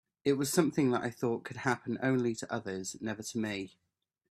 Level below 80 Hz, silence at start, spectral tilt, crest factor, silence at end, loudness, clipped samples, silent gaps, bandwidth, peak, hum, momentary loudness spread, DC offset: -72 dBFS; 0.25 s; -5 dB/octave; 22 dB; 0.65 s; -33 LUFS; under 0.1%; none; 15.5 kHz; -12 dBFS; none; 9 LU; under 0.1%